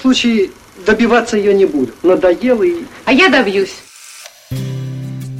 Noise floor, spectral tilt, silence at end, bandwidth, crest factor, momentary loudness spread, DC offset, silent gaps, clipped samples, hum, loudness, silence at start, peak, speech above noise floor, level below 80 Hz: -36 dBFS; -5 dB/octave; 0 s; 15 kHz; 14 dB; 17 LU; under 0.1%; none; under 0.1%; none; -13 LUFS; 0 s; 0 dBFS; 24 dB; -44 dBFS